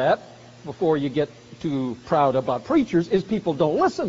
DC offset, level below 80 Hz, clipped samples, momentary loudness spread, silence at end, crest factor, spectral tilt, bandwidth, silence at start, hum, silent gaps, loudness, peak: under 0.1%; -56 dBFS; under 0.1%; 9 LU; 0 s; 16 dB; -6 dB/octave; 7.6 kHz; 0 s; none; none; -23 LUFS; -6 dBFS